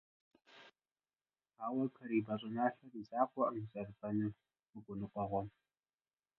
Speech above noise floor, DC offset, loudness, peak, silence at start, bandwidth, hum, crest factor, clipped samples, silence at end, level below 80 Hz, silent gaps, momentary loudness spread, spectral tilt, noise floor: over 50 dB; under 0.1%; -40 LUFS; -18 dBFS; 0.5 s; 5.6 kHz; none; 24 dB; under 0.1%; 0.9 s; -72 dBFS; 4.69-4.73 s; 15 LU; -6.5 dB/octave; under -90 dBFS